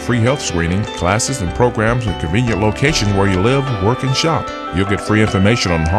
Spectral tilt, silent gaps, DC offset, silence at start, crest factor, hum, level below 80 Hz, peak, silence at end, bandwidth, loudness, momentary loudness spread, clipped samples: -5 dB/octave; none; under 0.1%; 0 s; 16 dB; none; -32 dBFS; 0 dBFS; 0 s; 13 kHz; -16 LUFS; 5 LU; under 0.1%